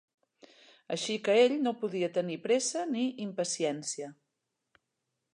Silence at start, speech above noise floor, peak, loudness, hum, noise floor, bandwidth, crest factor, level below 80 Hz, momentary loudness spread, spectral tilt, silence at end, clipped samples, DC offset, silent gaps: 0.9 s; 54 dB; -14 dBFS; -31 LUFS; none; -84 dBFS; 11 kHz; 18 dB; -86 dBFS; 12 LU; -3.5 dB/octave; 1.2 s; under 0.1%; under 0.1%; none